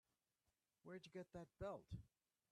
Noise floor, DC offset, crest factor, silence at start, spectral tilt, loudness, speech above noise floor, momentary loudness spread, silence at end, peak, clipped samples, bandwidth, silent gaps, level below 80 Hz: under -90 dBFS; under 0.1%; 18 dB; 0.85 s; -7 dB/octave; -57 LUFS; over 35 dB; 7 LU; 0.45 s; -40 dBFS; under 0.1%; 12 kHz; none; -72 dBFS